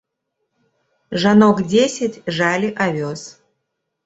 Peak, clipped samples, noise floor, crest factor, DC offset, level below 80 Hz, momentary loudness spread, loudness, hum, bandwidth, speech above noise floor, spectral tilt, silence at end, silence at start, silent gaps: -2 dBFS; under 0.1%; -75 dBFS; 18 dB; under 0.1%; -58 dBFS; 15 LU; -17 LUFS; none; 8 kHz; 59 dB; -5.5 dB/octave; 0.75 s; 1.1 s; none